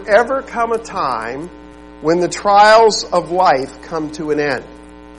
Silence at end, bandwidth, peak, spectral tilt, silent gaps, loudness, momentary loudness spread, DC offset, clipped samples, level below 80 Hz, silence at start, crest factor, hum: 0 s; 11.5 kHz; 0 dBFS; -3.5 dB/octave; none; -15 LUFS; 16 LU; 0.3%; under 0.1%; -44 dBFS; 0 s; 16 dB; none